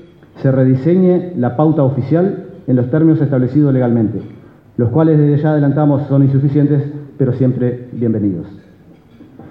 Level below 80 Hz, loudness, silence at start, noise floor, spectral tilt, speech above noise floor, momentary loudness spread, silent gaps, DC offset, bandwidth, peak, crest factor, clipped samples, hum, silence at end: -52 dBFS; -14 LUFS; 0.35 s; -43 dBFS; -12.5 dB/octave; 30 dB; 8 LU; none; under 0.1%; 4.2 kHz; -2 dBFS; 12 dB; under 0.1%; none; 0 s